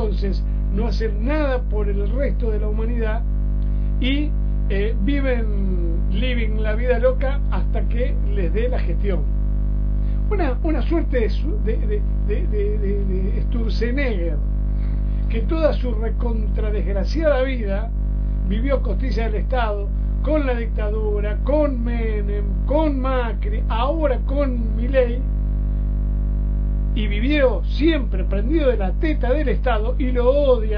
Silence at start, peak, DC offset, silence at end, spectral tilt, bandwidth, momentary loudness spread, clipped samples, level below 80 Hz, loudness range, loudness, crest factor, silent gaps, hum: 0 s; -4 dBFS; under 0.1%; 0 s; -9 dB/octave; 5.4 kHz; 4 LU; under 0.1%; -20 dBFS; 2 LU; -22 LUFS; 14 dB; none; 50 Hz at -20 dBFS